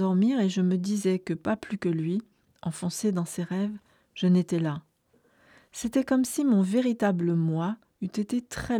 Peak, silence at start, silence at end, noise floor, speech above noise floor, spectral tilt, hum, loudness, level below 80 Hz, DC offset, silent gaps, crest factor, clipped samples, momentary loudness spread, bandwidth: -12 dBFS; 0 s; 0 s; -66 dBFS; 40 dB; -6.5 dB/octave; none; -27 LUFS; -60 dBFS; under 0.1%; none; 14 dB; under 0.1%; 11 LU; 15 kHz